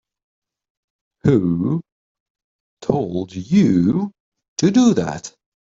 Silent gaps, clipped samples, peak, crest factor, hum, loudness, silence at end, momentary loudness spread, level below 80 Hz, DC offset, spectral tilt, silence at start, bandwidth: 1.92-2.35 s, 2.44-2.77 s, 4.20-4.32 s, 4.48-4.56 s; under 0.1%; -4 dBFS; 16 dB; none; -18 LUFS; 0.35 s; 14 LU; -52 dBFS; under 0.1%; -7 dB/octave; 1.25 s; 7.8 kHz